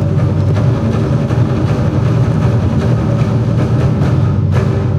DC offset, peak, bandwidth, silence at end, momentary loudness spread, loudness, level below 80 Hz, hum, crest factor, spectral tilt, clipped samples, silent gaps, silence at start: under 0.1%; -2 dBFS; 7.6 kHz; 0 s; 1 LU; -13 LUFS; -28 dBFS; none; 10 dB; -9 dB/octave; under 0.1%; none; 0 s